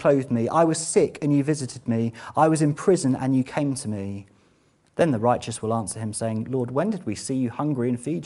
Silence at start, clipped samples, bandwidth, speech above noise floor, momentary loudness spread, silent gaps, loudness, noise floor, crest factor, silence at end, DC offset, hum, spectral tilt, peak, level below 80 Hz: 0 s; under 0.1%; 11.5 kHz; 39 dB; 8 LU; none; -24 LUFS; -62 dBFS; 18 dB; 0 s; under 0.1%; none; -6 dB/octave; -4 dBFS; -60 dBFS